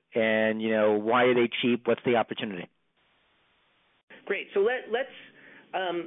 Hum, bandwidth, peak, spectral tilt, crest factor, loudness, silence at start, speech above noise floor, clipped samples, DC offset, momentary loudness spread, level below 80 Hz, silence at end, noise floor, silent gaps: none; 3.9 kHz; -12 dBFS; -9.5 dB/octave; 16 dB; -26 LUFS; 0.15 s; 43 dB; under 0.1%; under 0.1%; 13 LU; -74 dBFS; 0 s; -69 dBFS; 4.03-4.08 s